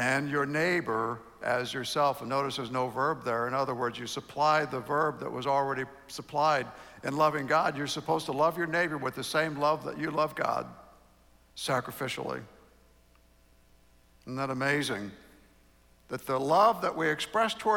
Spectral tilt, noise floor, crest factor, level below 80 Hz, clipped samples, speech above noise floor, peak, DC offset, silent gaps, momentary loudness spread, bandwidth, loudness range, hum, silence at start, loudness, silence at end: -4.5 dB/octave; -62 dBFS; 20 dB; -64 dBFS; under 0.1%; 32 dB; -12 dBFS; under 0.1%; none; 11 LU; 19 kHz; 7 LU; none; 0 s; -30 LUFS; 0 s